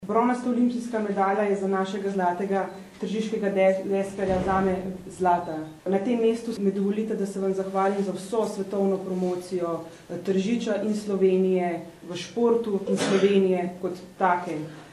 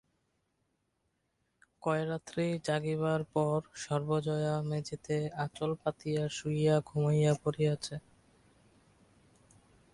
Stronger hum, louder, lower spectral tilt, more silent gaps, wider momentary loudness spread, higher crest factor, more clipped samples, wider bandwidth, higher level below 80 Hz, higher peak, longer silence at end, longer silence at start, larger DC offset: neither; first, -26 LUFS vs -33 LUFS; about the same, -6.5 dB/octave vs -6.5 dB/octave; neither; first, 11 LU vs 8 LU; about the same, 18 dB vs 18 dB; neither; about the same, 12.5 kHz vs 11.5 kHz; first, -56 dBFS vs -66 dBFS; first, -8 dBFS vs -16 dBFS; second, 0 s vs 1.95 s; second, 0 s vs 1.85 s; neither